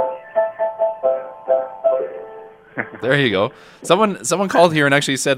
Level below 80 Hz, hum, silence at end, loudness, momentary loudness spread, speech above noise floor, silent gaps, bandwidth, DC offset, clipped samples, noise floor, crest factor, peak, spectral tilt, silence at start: -62 dBFS; none; 0 s; -18 LUFS; 14 LU; 22 dB; none; 15.5 kHz; under 0.1%; under 0.1%; -39 dBFS; 18 dB; 0 dBFS; -4 dB/octave; 0 s